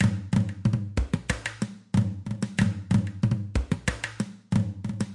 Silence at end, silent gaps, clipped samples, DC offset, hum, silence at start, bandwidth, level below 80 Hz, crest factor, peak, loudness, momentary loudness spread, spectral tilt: 0 s; none; under 0.1%; under 0.1%; none; 0 s; 11.5 kHz; -38 dBFS; 18 dB; -10 dBFS; -28 LUFS; 7 LU; -6.5 dB/octave